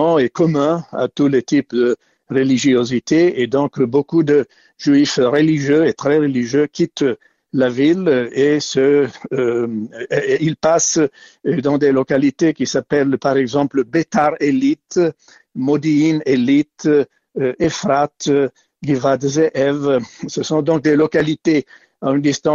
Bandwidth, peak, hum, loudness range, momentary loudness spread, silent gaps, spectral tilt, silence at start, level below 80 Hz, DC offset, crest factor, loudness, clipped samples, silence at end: 7.6 kHz; -4 dBFS; none; 2 LU; 7 LU; none; -5.5 dB/octave; 0 s; -56 dBFS; under 0.1%; 12 dB; -16 LUFS; under 0.1%; 0 s